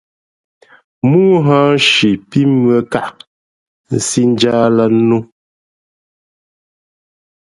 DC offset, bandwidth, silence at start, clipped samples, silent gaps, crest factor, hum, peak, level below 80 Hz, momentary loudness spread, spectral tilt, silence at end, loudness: under 0.1%; 11.5 kHz; 1.05 s; under 0.1%; 3.27-3.84 s; 14 dB; none; 0 dBFS; -54 dBFS; 9 LU; -5 dB/octave; 2.3 s; -12 LUFS